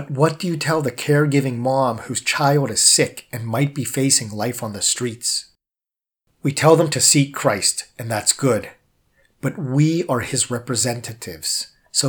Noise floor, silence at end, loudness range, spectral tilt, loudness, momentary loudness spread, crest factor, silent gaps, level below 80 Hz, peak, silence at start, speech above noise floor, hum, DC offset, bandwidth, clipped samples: -90 dBFS; 0 s; 4 LU; -3.5 dB/octave; -19 LUFS; 12 LU; 20 dB; none; -60 dBFS; 0 dBFS; 0 s; 70 dB; none; under 0.1%; over 20 kHz; under 0.1%